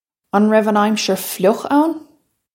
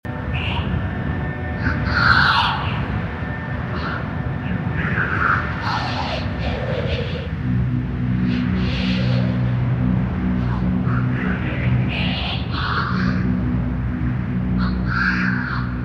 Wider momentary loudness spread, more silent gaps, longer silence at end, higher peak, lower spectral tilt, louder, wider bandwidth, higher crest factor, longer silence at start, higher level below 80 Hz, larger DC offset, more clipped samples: about the same, 7 LU vs 6 LU; neither; first, 0.5 s vs 0 s; about the same, -2 dBFS vs -2 dBFS; second, -5 dB/octave vs -7.5 dB/octave; first, -16 LUFS vs -21 LUFS; first, 17 kHz vs 6.8 kHz; about the same, 16 dB vs 18 dB; first, 0.35 s vs 0.05 s; second, -70 dBFS vs -30 dBFS; neither; neither